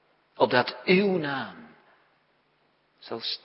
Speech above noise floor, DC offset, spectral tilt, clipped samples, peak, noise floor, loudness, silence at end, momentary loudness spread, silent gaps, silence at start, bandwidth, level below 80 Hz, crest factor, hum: 42 dB; under 0.1%; -9.5 dB/octave; under 0.1%; -4 dBFS; -68 dBFS; -25 LUFS; 0.05 s; 14 LU; none; 0.4 s; 5.8 kHz; -76 dBFS; 24 dB; none